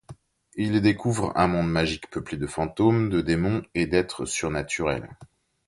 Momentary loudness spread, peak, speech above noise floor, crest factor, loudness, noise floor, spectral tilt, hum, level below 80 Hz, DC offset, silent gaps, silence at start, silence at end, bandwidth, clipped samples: 9 LU; -6 dBFS; 24 dB; 20 dB; -25 LUFS; -48 dBFS; -5.5 dB/octave; none; -46 dBFS; under 0.1%; none; 0.1 s; 0.4 s; 11.5 kHz; under 0.1%